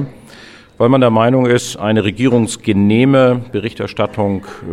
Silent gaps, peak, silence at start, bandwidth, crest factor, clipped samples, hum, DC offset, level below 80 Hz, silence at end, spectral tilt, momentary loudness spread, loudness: none; 0 dBFS; 0 s; 13 kHz; 14 dB; under 0.1%; none; under 0.1%; -48 dBFS; 0 s; -6.5 dB/octave; 10 LU; -14 LUFS